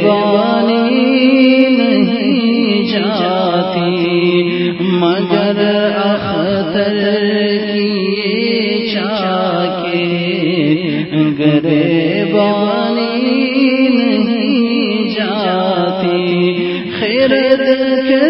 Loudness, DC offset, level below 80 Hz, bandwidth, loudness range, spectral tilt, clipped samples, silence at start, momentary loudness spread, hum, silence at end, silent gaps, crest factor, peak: -13 LUFS; under 0.1%; -54 dBFS; 5.8 kHz; 3 LU; -10 dB/octave; under 0.1%; 0 s; 5 LU; none; 0 s; none; 12 dB; 0 dBFS